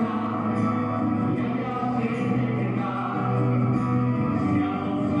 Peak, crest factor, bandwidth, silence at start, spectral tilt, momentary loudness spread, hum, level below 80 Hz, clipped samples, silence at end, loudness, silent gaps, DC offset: -12 dBFS; 12 dB; 7.4 kHz; 0 s; -9.5 dB/octave; 3 LU; none; -56 dBFS; under 0.1%; 0 s; -25 LUFS; none; under 0.1%